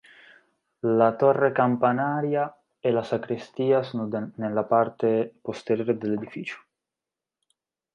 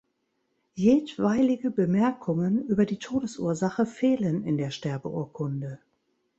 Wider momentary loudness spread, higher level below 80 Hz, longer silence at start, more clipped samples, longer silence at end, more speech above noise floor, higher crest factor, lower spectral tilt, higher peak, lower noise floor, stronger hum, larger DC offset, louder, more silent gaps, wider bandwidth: first, 12 LU vs 9 LU; second, -70 dBFS vs -62 dBFS; about the same, 0.85 s vs 0.75 s; neither; first, 1.35 s vs 0.65 s; first, 65 dB vs 50 dB; about the same, 18 dB vs 16 dB; about the same, -8 dB/octave vs -7.5 dB/octave; about the same, -8 dBFS vs -10 dBFS; first, -89 dBFS vs -75 dBFS; neither; neither; about the same, -25 LUFS vs -26 LUFS; neither; about the same, 8.8 kHz vs 8.2 kHz